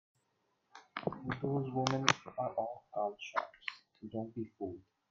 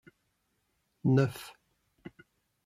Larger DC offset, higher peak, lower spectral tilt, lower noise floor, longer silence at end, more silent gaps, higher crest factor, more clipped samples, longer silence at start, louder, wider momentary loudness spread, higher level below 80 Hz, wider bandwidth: neither; first, -6 dBFS vs -14 dBFS; second, -4.5 dB/octave vs -8 dB/octave; about the same, -80 dBFS vs -77 dBFS; second, 0.3 s vs 1.15 s; neither; first, 32 dB vs 22 dB; neither; second, 0.75 s vs 1.05 s; second, -38 LUFS vs -29 LUFS; second, 13 LU vs 25 LU; about the same, -72 dBFS vs -70 dBFS; second, 7.8 kHz vs 15 kHz